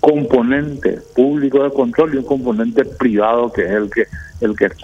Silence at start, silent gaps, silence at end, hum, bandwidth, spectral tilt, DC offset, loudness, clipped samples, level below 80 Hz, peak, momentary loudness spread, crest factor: 0.05 s; none; 0 s; none; 8 kHz; -8 dB/octave; under 0.1%; -16 LUFS; under 0.1%; -42 dBFS; 0 dBFS; 6 LU; 14 dB